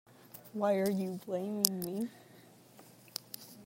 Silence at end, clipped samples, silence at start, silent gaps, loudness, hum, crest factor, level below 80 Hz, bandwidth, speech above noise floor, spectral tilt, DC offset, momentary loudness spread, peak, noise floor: 0 s; under 0.1%; 0.25 s; none; -35 LUFS; none; 36 dB; -78 dBFS; 16.5 kHz; 25 dB; -4 dB/octave; under 0.1%; 16 LU; -2 dBFS; -59 dBFS